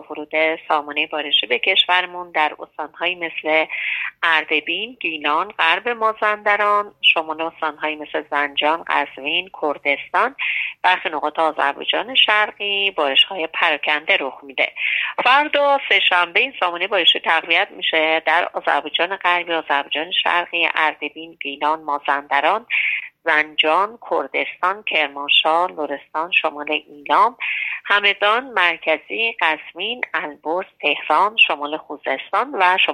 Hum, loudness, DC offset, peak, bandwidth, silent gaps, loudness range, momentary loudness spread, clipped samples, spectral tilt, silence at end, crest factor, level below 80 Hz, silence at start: none; -18 LUFS; under 0.1%; -2 dBFS; 10.5 kHz; none; 3 LU; 9 LU; under 0.1%; -2.5 dB/octave; 0 s; 18 dB; -70 dBFS; 0 s